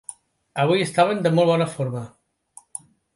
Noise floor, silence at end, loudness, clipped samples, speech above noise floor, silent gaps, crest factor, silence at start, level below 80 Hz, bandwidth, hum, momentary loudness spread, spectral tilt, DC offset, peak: -52 dBFS; 1.1 s; -21 LUFS; under 0.1%; 32 dB; none; 18 dB; 0.1 s; -66 dBFS; 11.5 kHz; none; 19 LU; -5.5 dB/octave; under 0.1%; -4 dBFS